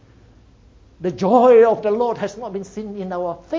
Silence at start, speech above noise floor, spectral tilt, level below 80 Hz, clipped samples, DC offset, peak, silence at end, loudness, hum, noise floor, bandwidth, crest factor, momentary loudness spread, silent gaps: 1 s; 32 dB; -7 dB/octave; -54 dBFS; under 0.1%; under 0.1%; -2 dBFS; 0 s; -17 LUFS; none; -49 dBFS; 7.6 kHz; 18 dB; 18 LU; none